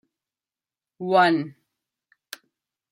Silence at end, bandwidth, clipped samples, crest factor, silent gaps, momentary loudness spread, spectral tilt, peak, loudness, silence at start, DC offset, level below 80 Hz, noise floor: 1.4 s; 16.5 kHz; under 0.1%; 20 dB; none; 23 LU; -5.5 dB/octave; -8 dBFS; -21 LUFS; 1 s; under 0.1%; -78 dBFS; under -90 dBFS